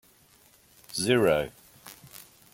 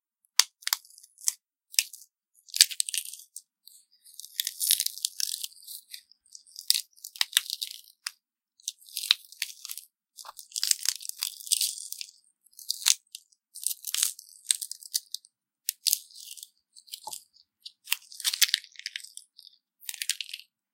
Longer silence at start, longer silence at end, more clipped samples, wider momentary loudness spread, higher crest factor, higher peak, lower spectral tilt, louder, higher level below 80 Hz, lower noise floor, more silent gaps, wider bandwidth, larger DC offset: first, 0.9 s vs 0.4 s; about the same, 0.35 s vs 0.35 s; neither; first, 25 LU vs 21 LU; second, 22 dB vs 34 dB; second, -8 dBFS vs 0 dBFS; first, -4.5 dB/octave vs 6.5 dB/octave; about the same, -26 LUFS vs -28 LUFS; first, -60 dBFS vs -86 dBFS; second, -60 dBFS vs -68 dBFS; neither; about the same, 17 kHz vs 17 kHz; neither